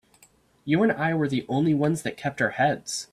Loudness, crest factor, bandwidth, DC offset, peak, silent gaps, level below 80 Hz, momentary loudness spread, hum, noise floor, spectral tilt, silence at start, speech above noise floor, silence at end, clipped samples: -25 LUFS; 16 dB; 13.5 kHz; under 0.1%; -8 dBFS; none; -62 dBFS; 7 LU; none; -60 dBFS; -5.5 dB/octave; 0.65 s; 35 dB; 0.1 s; under 0.1%